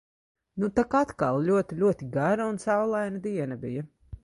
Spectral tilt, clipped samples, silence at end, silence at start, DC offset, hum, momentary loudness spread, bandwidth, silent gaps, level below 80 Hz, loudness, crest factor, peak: -7.5 dB/octave; under 0.1%; 0.05 s; 0.55 s; under 0.1%; none; 10 LU; 11.5 kHz; none; -56 dBFS; -27 LUFS; 16 dB; -10 dBFS